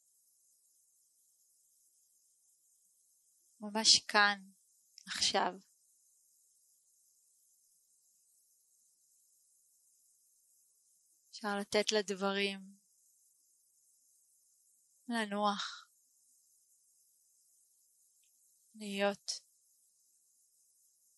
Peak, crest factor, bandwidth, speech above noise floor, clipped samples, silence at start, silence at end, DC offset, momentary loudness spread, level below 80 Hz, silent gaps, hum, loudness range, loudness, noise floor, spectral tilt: -10 dBFS; 30 dB; 12 kHz; 39 dB; under 0.1%; 3.6 s; 1.8 s; under 0.1%; 25 LU; -84 dBFS; none; none; 12 LU; -33 LUFS; -73 dBFS; -1.5 dB/octave